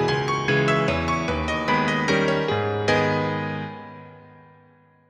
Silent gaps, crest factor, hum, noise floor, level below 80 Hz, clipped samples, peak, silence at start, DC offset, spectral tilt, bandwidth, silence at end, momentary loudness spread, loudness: none; 16 dB; none; -55 dBFS; -44 dBFS; under 0.1%; -8 dBFS; 0 s; under 0.1%; -5.5 dB/octave; 10 kHz; 0.8 s; 12 LU; -22 LUFS